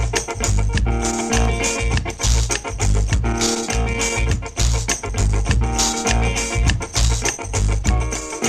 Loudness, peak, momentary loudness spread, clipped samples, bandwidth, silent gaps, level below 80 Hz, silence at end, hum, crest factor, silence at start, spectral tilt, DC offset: -20 LUFS; -2 dBFS; 3 LU; under 0.1%; 14 kHz; none; -22 dBFS; 0 s; none; 16 dB; 0 s; -3.5 dB/octave; under 0.1%